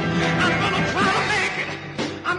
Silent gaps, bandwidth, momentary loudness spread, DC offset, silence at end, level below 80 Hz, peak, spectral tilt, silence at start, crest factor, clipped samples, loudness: none; 11 kHz; 9 LU; under 0.1%; 0 s; -48 dBFS; -10 dBFS; -4.5 dB/octave; 0 s; 12 dB; under 0.1%; -21 LUFS